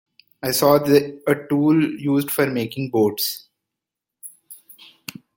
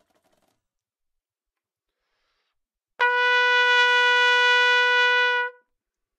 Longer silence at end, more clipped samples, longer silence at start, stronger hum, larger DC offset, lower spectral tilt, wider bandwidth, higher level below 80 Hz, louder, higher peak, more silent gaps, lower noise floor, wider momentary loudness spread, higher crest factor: first, 0.85 s vs 0.65 s; neither; second, 0.45 s vs 3 s; neither; neither; first, -5 dB/octave vs 4.5 dB/octave; first, 17 kHz vs 9.8 kHz; first, -62 dBFS vs -90 dBFS; about the same, -20 LUFS vs -18 LUFS; first, -2 dBFS vs -6 dBFS; neither; about the same, -85 dBFS vs -88 dBFS; first, 22 LU vs 6 LU; about the same, 20 dB vs 16 dB